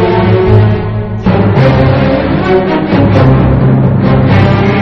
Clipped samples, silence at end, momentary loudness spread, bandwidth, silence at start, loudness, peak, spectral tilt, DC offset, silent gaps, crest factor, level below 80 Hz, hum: 1%; 0 s; 4 LU; 6 kHz; 0 s; -8 LUFS; 0 dBFS; -9.5 dB/octave; under 0.1%; none; 8 dB; -22 dBFS; none